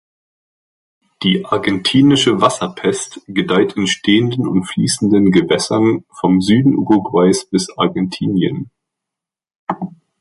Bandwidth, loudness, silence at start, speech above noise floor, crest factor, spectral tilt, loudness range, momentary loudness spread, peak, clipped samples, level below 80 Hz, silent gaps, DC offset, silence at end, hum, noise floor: 11.5 kHz; -15 LUFS; 1.2 s; 70 dB; 16 dB; -5 dB/octave; 2 LU; 11 LU; 0 dBFS; under 0.1%; -50 dBFS; 9.58-9.67 s; under 0.1%; 0.3 s; none; -84 dBFS